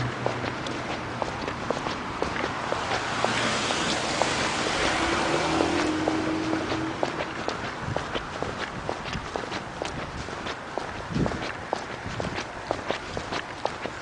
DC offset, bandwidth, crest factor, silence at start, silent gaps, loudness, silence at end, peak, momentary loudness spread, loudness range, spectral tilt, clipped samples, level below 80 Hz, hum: under 0.1%; 10.5 kHz; 24 dB; 0 s; none; -28 LUFS; 0 s; -4 dBFS; 8 LU; 7 LU; -4 dB/octave; under 0.1%; -46 dBFS; none